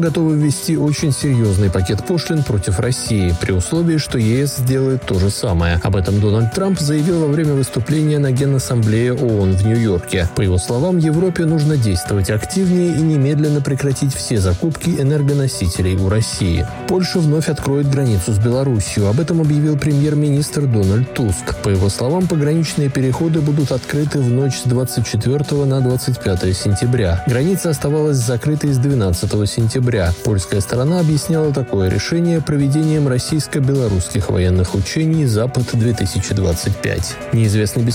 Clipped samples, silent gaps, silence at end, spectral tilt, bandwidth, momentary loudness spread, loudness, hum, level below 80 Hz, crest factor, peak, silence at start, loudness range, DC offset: under 0.1%; none; 0 s; -6 dB/octave; 17 kHz; 3 LU; -16 LUFS; none; -38 dBFS; 10 dB; -6 dBFS; 0 s; 1 LU; under 0.1%